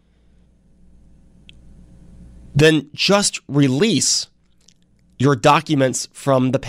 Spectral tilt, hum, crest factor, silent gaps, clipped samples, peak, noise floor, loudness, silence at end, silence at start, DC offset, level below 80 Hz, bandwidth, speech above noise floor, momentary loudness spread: -4 dB/octave; none; 16 dB; none; under 0.1%; -4 dBFS; -55 dBFS; -17 LUFS; 0 s; 2.2 s; under 0.1%; -48 dBFS; 15.5 kHz; 39 dB; 6 LU